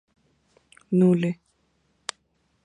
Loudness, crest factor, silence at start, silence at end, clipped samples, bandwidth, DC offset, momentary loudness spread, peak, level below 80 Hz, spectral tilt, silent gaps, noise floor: -22 LUFS; 22 dB; 0.9 s; 1.3 s; under 0.1%; 10.5 kHz; under 0.1%; 17 LU; -6 dBFS; -70 dBFS; -7.5 dB/octave; none; -69 dBFS